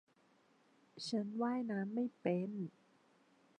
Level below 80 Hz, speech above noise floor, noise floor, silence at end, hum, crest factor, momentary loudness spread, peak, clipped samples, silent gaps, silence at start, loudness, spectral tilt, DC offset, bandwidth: under -90 dBFS; 33 dB; -72 dBFS; 0.9 s; none; 20 dB; 9 LU; -24 dBFS; under 0.1%; none; 0.95 s; -40 LUFS; -6.5 dB/octave; under 0.1%; 10 kHz